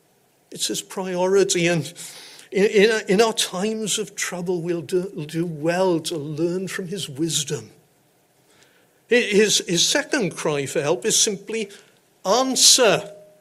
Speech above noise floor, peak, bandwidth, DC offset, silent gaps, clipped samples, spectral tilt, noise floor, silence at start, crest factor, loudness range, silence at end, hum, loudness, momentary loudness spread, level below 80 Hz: 40 dB; -2 dBFS; 16 kHz; under 0.1%; none; under 0.1%; -2.5 dB/octave; -61 dBFS; 0.5 s; 20 dB; 6 LU; 0.2 s; none; -20 LUFS; 12 LU; -66 dBFS